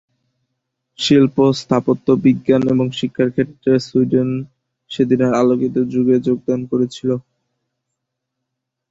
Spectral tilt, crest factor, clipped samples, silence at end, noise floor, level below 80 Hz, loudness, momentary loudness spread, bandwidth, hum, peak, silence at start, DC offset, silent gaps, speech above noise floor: -7 dB/octave; 16 dB; under 0.1%; 1.7 s; -78 dBFS; -56 dBFS; -17 LUFS; 8 LU; 7.8 kHz; none; 0 dBFS; 1 s; under 0.1%; none; 63 dB